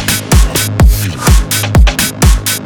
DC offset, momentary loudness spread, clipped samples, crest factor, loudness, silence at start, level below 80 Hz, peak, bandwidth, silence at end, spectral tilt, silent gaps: under 0.1%; 2 LU; under 0.1%; 8 dB; -10 LUFS; 0 s; -12 dBFS; 0 dBFS; 19.5 kHz; 0 s; -4 dB/octave; none